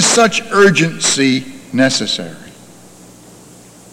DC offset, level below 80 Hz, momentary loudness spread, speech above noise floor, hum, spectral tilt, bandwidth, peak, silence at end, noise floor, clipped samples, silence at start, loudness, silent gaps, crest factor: under 0.1%; -54 dBFS; 11 LU; 27 dB; none; -3 dB/octave; 16 kHz; 0 dBFS; 1.4 s; -40 dBFS; under 0.1%; 0 s; -13 LUFS; none; 14 dB